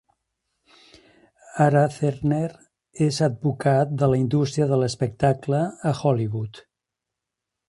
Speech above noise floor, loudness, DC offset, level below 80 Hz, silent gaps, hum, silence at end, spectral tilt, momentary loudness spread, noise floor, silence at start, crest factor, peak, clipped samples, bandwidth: 63 dB; -22 LUFS; under 0.1%; -54 dBFS; none; none; 1.1 s; -7 dB/octave; 7 LU; -85 dBFS; 1.55 s; 20 dB; -4 dBFS; under 0.1%; 11.5 kHz